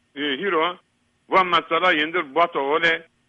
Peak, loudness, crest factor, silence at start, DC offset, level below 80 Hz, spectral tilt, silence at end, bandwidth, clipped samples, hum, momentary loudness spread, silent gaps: -6 dBFS; -20 LUFS; 16 dB; 0.15 s; under 0.1%; -64 dBFS; -4.5 dB/octave; 0.25 s; 8.2 kHz; under 0.1%; none; 7 LU; none